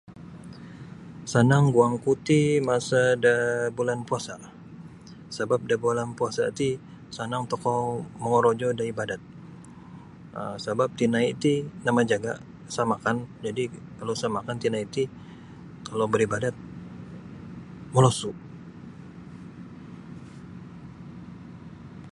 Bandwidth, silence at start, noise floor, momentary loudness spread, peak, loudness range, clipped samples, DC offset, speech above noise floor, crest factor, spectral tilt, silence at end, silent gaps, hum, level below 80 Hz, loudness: 11.5 kHz; 0.1 s; -45 dBFS; 22 LU; -4 dBFS; 7 LU; under 0.1%; under 0.1%; 20 dB; 22 dB; -6 dB/octave; 0.05 s; none; none; -58 dBFS; -26 LUFS